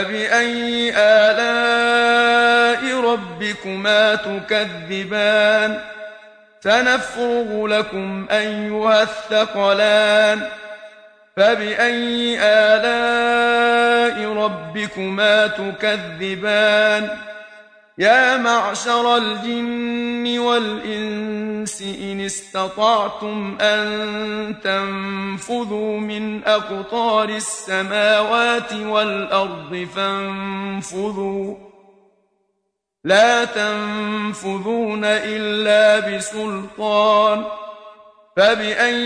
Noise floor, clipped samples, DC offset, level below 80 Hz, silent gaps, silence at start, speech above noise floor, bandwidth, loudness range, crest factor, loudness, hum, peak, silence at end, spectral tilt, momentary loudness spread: -75 dBFS; under 0.1%; under 0.1%; -58 dBFS; none; 0 s; 56 dB; 10.5 kHz; 6 LU; 18 dB; -18 LUFS; none; -2 dBFS; 0 s; -3.5 dB/octave; 12 LU